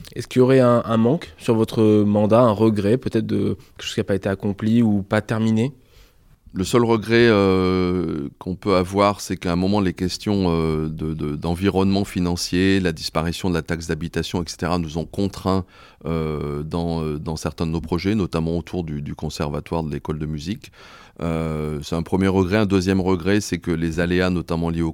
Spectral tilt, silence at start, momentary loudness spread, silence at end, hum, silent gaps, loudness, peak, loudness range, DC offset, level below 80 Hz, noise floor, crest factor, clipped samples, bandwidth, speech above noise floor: -6.5 dB/octave; 0 s; 11 LU; 0 s; none; none; -21 LUFS; -4 dBFS; 6 LU; under 0.1%; -44 dBFS; -51 dBFS; 18 dB; under 0.1%; 16.5 kHz; 31 dB